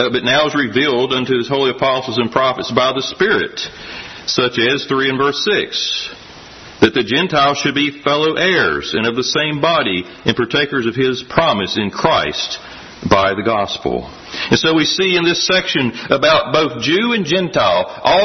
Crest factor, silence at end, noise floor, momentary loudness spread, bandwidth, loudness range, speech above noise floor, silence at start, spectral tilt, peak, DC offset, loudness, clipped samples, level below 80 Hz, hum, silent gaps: 16 dB; 0 s; -36 dBFS; 9 LU; 6.4 kHz; 3 LU; 21 dB; 0 s; -4 dB/octave; 0 dBFS; under 0.1%; -15 LUFS; under 0.1%; -46 dBFS; none; none